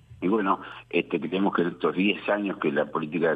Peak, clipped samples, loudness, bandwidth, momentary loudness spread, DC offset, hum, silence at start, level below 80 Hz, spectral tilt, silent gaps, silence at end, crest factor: -10 dBFS; under 0.1%; -26 LUFS; 4.9 kHz; 4 LU; under 0.1%; none; 0.1 s; -64 dBFS; -8.5 dB/octave; none; 0 s; 16 dB